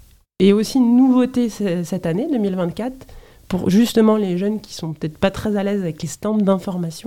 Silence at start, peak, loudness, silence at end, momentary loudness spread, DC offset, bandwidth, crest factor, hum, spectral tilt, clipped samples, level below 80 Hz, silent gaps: 0.4 s; -2 dBFS; -19 LUFS; 0.05 s; 12 LU; 0.3%; 16 kHz; 16 dB; none; -6.5 dB/octave; under 0.1%; -48 dBFS; none